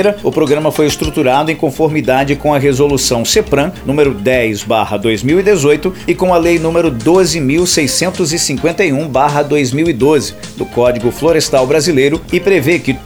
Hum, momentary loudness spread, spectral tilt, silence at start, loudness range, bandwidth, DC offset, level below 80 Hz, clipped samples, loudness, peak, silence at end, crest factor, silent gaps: none; 4 LU; -4.5 dB/octave; 0 s; 1 LU; over 20 kHz; under 0.1%; -34 dBFS; under 0.1%; -12 LUFS; 0 dBFS; 0 s; 12 dB; none